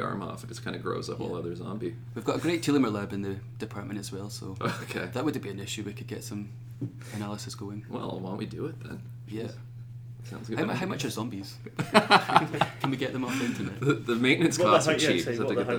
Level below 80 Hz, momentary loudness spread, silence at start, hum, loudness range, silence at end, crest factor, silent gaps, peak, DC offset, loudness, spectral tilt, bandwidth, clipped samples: -60 dBFS; 16 LU; 0 s; none; 12 LU; 0 s; 28 dB; none; 0 dBFS; under 0.1%; -29 LUFS; -5 dB/octave; over 20 kHz; under 0.1%